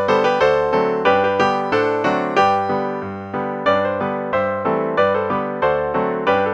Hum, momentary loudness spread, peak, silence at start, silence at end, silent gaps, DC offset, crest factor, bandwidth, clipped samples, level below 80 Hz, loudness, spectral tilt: none; 6 LU; -2 dBFS; 0 s; 0 s; none; under 0.1%; 16 dB; 8 kHz; under 0.1%; -52 dBFS; -18 LUFS; -6 dB/octave